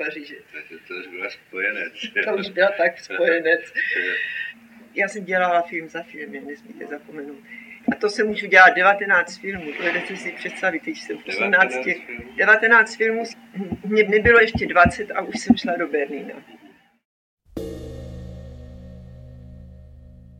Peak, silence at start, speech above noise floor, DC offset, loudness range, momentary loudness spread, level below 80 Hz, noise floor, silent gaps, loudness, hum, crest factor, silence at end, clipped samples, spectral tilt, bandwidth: 0 dBFS; 0 s; 31 dB; under 0.1%; 12 LU; 22 LU; -46 dBFS; -52 dBFS; 17.05-17.37 s; -19 LUFS; none; 22 dB; 0.35 s; under 0.1%; -4.5 dB/octave; 15 kHz